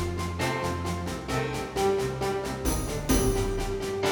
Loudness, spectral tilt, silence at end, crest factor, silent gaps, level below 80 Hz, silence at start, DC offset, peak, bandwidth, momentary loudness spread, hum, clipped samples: -29 LUFS; -5 dB/octave; 0 s; 18 dB; none; -36 dBFS; 0 s; under 0.1%; -10 dBFS; over 20 kHz; 6 LU; none; under 0.1%